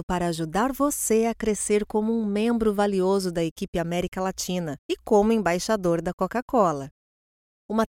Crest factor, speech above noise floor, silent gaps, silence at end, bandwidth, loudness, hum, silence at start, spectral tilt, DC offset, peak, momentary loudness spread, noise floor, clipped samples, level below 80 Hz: 16 dB; over 66 dB; 0.03-0.08 s, 3.51-3.56 s, 3.68-3.73 s, 4.08-4.12 s, 4.79-4.89 s, 6.13-6.18 s, 6.42-6.48 s, 6.91-7.69 s; 0.05 s; 17 kHz; -25 LUFS; none; 0 s; -5 dB/octave; under 0.1%; -8 dBFS; 7 LU; under -90 dBFS; under 0.1%; -48 dBFS